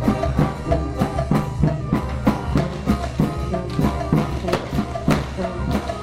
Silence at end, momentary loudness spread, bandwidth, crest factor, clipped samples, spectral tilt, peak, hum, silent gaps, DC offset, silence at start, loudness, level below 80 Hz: 0 s; 4 LU; 15.5 kHz; 16 dB; under 0.1%; -7.5 dB/octave; -4 dBFS; none; none; under 0.1%; 0 s; -22 LUFS; -30 dBFS